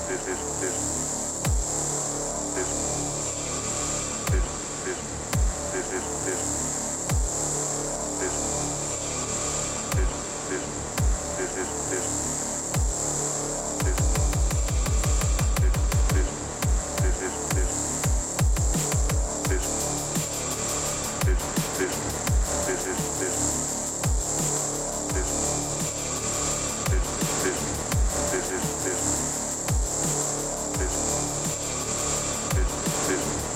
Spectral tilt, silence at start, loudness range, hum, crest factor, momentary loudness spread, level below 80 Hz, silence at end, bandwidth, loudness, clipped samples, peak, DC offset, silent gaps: -3.5 dB/octave; 0 s; 2 LU; none; 14 dB; 3 LU; -32 dBFS; 0 s; 16.5 kHz; -26 LUFS; under 0.1%; -12 dBFS; under 0.1%; none